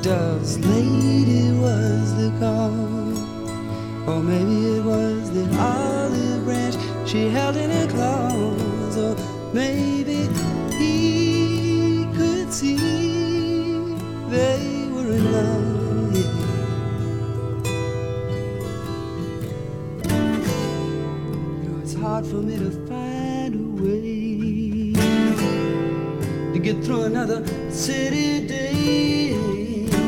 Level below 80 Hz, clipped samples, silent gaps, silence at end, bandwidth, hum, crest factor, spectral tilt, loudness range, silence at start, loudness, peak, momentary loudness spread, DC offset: -44 dBFS; under 0.1%; none; 0 s; 17 kHz; none; 16 dB; -6 dB/octave; 5 LU; 0 s; -22 LUFS; -6 dBFS; 8 LU; under 0.1%